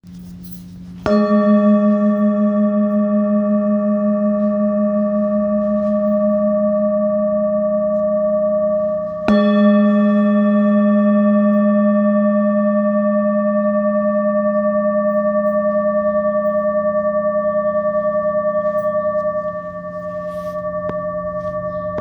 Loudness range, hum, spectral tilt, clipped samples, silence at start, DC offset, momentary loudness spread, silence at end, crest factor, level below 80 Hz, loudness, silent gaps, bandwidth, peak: 5 LU; none; -10 dB/octave; under 0.1%; 0.05 s; under 0.1%; 10 LU; 0 s; 16 dB; -50 dBFS; -17 LUFS; none; over 20 kHz; 0 dBFS